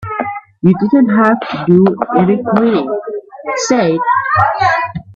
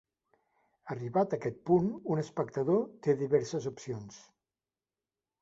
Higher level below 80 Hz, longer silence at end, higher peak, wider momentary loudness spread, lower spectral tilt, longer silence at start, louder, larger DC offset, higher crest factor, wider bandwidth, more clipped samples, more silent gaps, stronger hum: first, -50 dBFS vs -70 dBFS; second, 0.05 s vs 1.25 s; first, 0 dBFS vs -14 dBFS; about the same, 11 LU vs 13 LU; second, -6 dB/octave vs -7.5 dB/octave; second, 0 s vs 0.85 s; first, -13 LUFS vs -32 LUFS; neither; second, 12 dB vs 20 dB; about the same, 7.8 kHz vs 8 kHz; neither; neither; neither